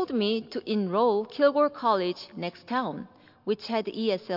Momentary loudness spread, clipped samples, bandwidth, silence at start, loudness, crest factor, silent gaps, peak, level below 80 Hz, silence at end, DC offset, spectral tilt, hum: 12 LU; under 0.1%; 5.8 kHz; 0 s; -27 LUFS; 16 dB; none; -12 dBFS; -76 dBFS; 0 s; under 0.1%; -7 dB/octave; none